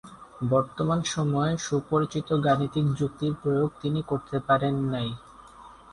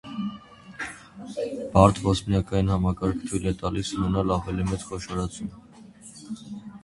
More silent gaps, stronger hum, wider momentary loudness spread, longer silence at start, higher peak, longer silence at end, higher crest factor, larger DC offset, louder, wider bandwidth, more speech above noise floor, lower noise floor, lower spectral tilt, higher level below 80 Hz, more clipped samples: neither; neither; second, 6 LU vs 20 LU; about the same, 0.05 s vs 0.05 s; second, -8 dBFS vs -2 dBFS; about the same, 0 s vs 0.05 s; second, 18 dB vs 24 dB; neither; about the same, -27 LUFS vs -26 LUFS; about the same, 11 kHz vs 11.5 kHz; about the same, 23 dB vs 23 dB; about the same, -49 dBFS vs -47 dBFS; about the same, -6.5 dB/octave vs -6.5 dB/octave; second, -56 dBFS vs -40 dBFS; neither